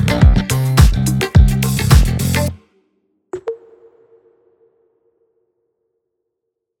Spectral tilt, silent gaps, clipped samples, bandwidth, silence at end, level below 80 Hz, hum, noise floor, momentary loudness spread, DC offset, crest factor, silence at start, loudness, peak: -5.5 dB/octave; none; under 0.1%; 18.5 kHz; 3.25 s; -20 dBFS; none; -77 dBFS; 16 LU; under 0.1%; 16 dB; 0 s; -14 LUFS; 0 dBFS